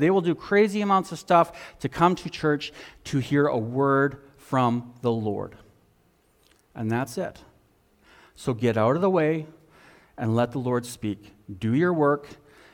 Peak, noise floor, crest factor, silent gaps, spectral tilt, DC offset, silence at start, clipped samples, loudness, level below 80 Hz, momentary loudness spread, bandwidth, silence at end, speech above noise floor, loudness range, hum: -6 dBFS; -63 dBFS; 20 dB; none; -7 dB/octave; under 0.1%; 0 s; under 0.1%; -25 LUFS; -58 dBFS; 13 LU; 17 kHz; 0.4 s; 39 dB; 8 LU; none